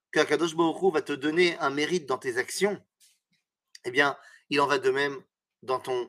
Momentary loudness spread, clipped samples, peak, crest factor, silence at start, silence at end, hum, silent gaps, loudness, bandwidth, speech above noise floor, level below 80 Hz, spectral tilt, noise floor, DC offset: 10 LU; under 0.1%; -6 dBFS; 22 dB; 0.15 s; 0 s; none; none; -27 LUFS; 15.5 kHz; 51 dB; -80 dBFS; -4 dB/octave; -77 dBFS; under 0.1%